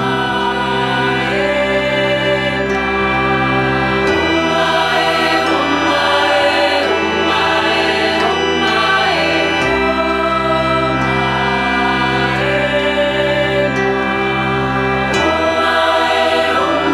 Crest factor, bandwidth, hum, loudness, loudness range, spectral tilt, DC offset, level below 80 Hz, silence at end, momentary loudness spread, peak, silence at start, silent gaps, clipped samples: 14 dB; 15.5 kHz; none; -14 LUFS; 2 LU; -4.5 dB/octave; under 0.1%; -36 dBFS; 0 s; 3 LU; -2 dBFS; 0 s; none; under 0.1%